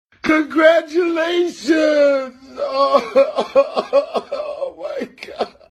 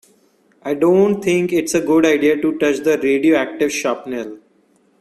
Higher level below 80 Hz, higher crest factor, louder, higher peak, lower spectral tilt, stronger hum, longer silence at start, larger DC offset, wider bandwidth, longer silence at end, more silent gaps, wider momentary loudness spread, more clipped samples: about the same, -60 dBFS vs -58 dBFS; about the same, 16 dB vs 16 dB; about the same, -17 LUFS vs -16 LUFS; about the same, 0 dBFS vs -2 dBFS; about the same, -4 dB/octave vs -5 dB/octave; neither; second, 0.25 s vs 0.65 s; neither; second, 11.5 kHz vs 14 kHz; second, 0.2 s vs 0.65 s; neither; about the same, 14 LU vs 12 LU; neither